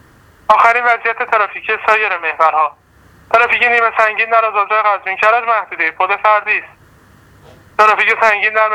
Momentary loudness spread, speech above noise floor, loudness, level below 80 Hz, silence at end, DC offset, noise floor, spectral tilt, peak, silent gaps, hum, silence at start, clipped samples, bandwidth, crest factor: 7 LU; 33 dB; -12 LUFS; -56 dBFS; 0 s; under 0.1%; -46 dBFS; -2.5 dB/octave; 0 dBFS; none; none; 0.5 s; under 0.1%; 13.5 kHz; 14 dB